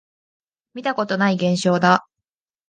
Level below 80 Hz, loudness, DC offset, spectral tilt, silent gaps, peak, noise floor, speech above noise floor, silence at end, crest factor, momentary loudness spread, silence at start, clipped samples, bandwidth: -66 dBFS; -19 LUFS; under 0.1%; -5.5 dB/octave; none; 0 dBFS; -85 dBFS; 66 dB; 0.7 s; 20 dB; 10 LU; 0.75 s; under 0.1%; 9.6 kHz